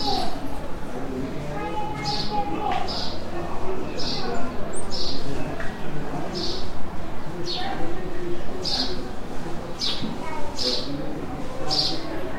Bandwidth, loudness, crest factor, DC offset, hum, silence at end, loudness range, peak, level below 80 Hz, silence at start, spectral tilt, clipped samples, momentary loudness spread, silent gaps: 11 kHz; -29 LUFS; 12 dB; under 0.1%; none; 0 s; 3 LU; -8 dBFS; -36 dBFS; 0 s; -4.5 dB/octave; under 0.1%; 9 LU; none